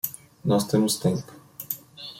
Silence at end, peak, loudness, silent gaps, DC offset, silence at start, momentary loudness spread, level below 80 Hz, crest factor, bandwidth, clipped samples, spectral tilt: 0 s; -8 dBFS; -26 LUFS; none; under 0.1%; 0.05 s; 14 LU; -60 dBFS; 18 dB; 16.5 kHz; under 0.1%; -5.5 dB/octave